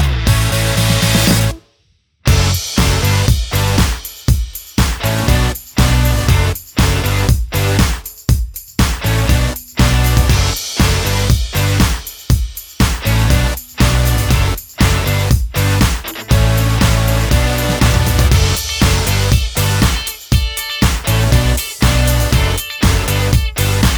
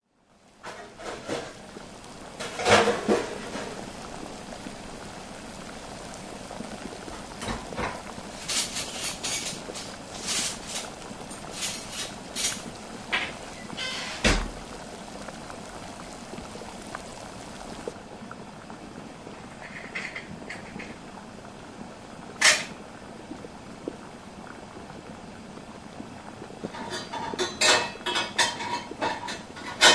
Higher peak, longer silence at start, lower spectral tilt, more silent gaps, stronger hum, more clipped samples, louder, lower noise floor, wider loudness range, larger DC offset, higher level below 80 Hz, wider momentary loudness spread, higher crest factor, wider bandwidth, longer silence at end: first, 0 dBFS vs -4 dBFS; second, 0 s vs 0.45 s; first, -4.5 dB/octave vs -2 dB/octave; neither; neither; neither; first, -14 LUFS vs -29 LUFS; about the same, -58 dBFS vs -60 dBFS; second, 2 LU vs 13 LU; neither; first, -18 dBFS vs -48 dBFS; second, 5 LU vs 18 LU; second, 14 dB vs 26 dB; first, over 20 kHz vs 11 kHz; about the same, 0 s vs 0 s